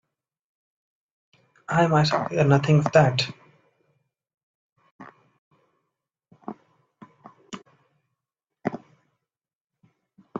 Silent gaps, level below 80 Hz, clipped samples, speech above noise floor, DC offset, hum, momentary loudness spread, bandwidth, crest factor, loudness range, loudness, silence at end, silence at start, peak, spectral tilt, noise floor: 4.34-4.76 s, 4.91-4.99 s, 5.38-5.51 s, 9.55-9.65 s; -62 dBFS; under 0.1%; over 70 dB; under 0.1%; none; 24 LU; 7.6 kHz; 22 dB; 24 LU; -22 LUFS; 0 s; 1.7 s; -4 dBFS; -6.5 dB/octave; under -90 dBFS